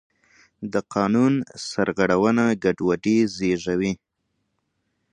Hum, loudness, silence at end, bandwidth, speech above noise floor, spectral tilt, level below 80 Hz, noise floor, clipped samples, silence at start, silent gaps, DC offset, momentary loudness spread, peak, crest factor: none; -22 LUFS; 1.2 s; 10 kHz; 54 dB; -6 dB/octave; -56 dBFS; -75 dBFS; under 0.1%; 0.6 s; none; under 0.1%; 9 LU; -4 dBFS; 18 dB